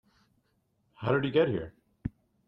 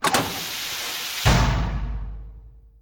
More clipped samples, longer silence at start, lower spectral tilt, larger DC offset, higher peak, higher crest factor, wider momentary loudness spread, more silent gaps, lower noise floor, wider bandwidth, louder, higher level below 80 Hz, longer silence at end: neither; first, 1 s vs 0 s; first, -9.5 dB/octave vs -3.5 dB/octave; neither; second, -12 dBFS vs -8 dBFS; about the same, 20 dB vs 18 dB; second, 15 LU vs 18 LU; neither; first, -74 dBFS vs -45 dBFS; second, 5.6 kHz vs 19.5 kHz; second, -29 LUFS vs -24 LUFS; second, -56 dBFS vs -30 dBFS; first, 0.4 s vs 0.15 s